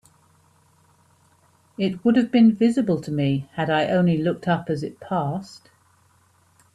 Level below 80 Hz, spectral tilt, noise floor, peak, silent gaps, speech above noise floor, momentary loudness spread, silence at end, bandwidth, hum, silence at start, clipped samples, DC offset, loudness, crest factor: -62 dBFS; -7.5 dB/octave; -60 dBFS; -8 dBFS; none; 39 dB; 12 LU; 1.2 s; 10.5 kHz; none; 1.8 s; under 0.1%; under 0.1%; -22 LUFS; 16 dB